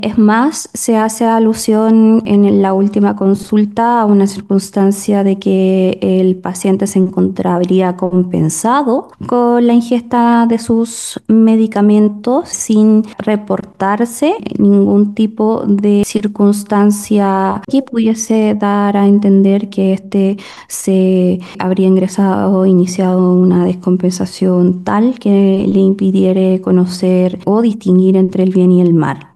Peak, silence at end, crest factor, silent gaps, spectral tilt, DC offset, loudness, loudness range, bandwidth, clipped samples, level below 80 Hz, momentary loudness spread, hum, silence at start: 0 dBFS; 0.1 s; 10 dB; none; -7 dB/octave; under 0.1%; -12 LUFS; 2 LU; 12.5 kHz; under 0.1%; -54 dBFS; 6 LU; none; 0 s